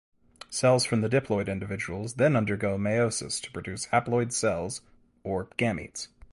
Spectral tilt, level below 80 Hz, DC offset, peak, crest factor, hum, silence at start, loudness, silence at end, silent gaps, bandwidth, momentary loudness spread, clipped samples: -5 dB/octave; -54 dBFS; under 0.1%; -10 dBFS; 18 dB; none; 0.5 s; -28 LUFS; 0.25 s; none; 11.5 kHz; 12 LU; under 0.1%